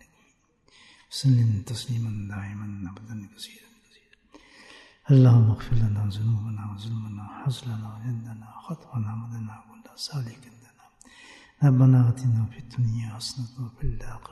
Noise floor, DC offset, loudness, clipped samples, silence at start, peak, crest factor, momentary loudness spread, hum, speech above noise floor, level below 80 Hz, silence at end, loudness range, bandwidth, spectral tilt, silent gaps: -65 dBFS; under 0.1%; -25 LUFS; under 0.1%; 1.1 s; -8 dBFS; 18 dB; 21 LU; none; 40 dB; -44 dBFS; 0.1 s; 12 LU; 12 kHz; -7.5 dB/octave; none